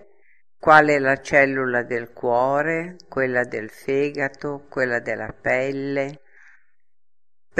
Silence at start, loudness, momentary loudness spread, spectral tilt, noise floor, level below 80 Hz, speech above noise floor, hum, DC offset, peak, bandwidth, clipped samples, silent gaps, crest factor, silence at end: 0.65 s; -21 LUFS; 14 LU; -6 dB/octave; -57 dBFS; -56 dBFS; 36 dB; none; 0.3%; 0 dBFS; 13.5 kHz; under 0.1%; none; 22 dB; 0 s